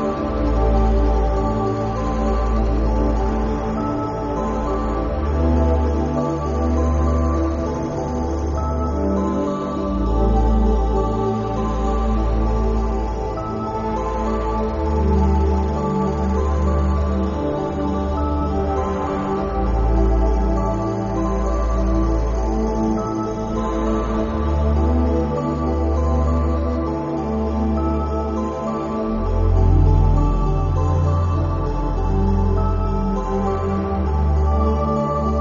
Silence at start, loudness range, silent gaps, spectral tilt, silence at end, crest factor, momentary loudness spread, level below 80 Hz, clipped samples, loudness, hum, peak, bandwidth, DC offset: 0 s; 2 LU; none; -8.5 dB/octave; 0 s; 14 dB; 5 LU; -22 dBFS; under 0.1%; -21 LUFS; none; -4 dBFS; 7.2 kHz; under 0.1%